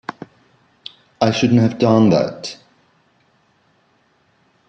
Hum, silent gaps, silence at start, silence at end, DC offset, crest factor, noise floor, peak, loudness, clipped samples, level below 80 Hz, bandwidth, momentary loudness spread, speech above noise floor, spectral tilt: none; none; 0.1 s; 2.15 s; under 0.1%; 18 dB; -60 dBFS; -2 dBFS; -15 LUFS; under 0.1%; -56 dBFS; 8.2 kHz; 24 LU; 45 dB; -6.5 dB/octave